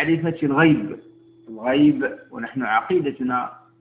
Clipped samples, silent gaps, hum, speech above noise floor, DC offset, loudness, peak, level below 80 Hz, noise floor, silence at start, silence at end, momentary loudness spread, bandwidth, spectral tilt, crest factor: under 0.1%; none; none; 21 dB; under 0.1%; -21 LUFS; -4 dBFS; -58 dBFS; -41 dBFS; 0 s; 0.25 s; 16 LU; 4 kHz; -10.5 dB/octave; 18 dB